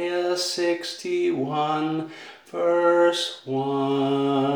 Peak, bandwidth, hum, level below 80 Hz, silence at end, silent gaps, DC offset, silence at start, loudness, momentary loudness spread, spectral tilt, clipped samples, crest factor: -8 dBFS; over 20 kHz; none; -80 dBFS; 0 s; none; under 0.1%; 0 s; -23 LUFS; 9 LU; -5 dB/octave; under 0.1%; 16 dB